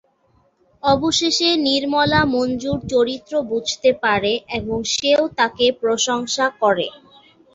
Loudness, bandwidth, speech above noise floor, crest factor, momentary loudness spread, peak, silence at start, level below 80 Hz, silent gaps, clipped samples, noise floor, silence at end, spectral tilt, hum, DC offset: -18 LUFS; 8 kHz; 42 dB; 18 dB; 7 LU; -2 dBFS; 0.85 s; -48 dBFS; none; under 0.1%; -60 dBFS; 0.65 s; -3 dB/octave; none; under 0.1%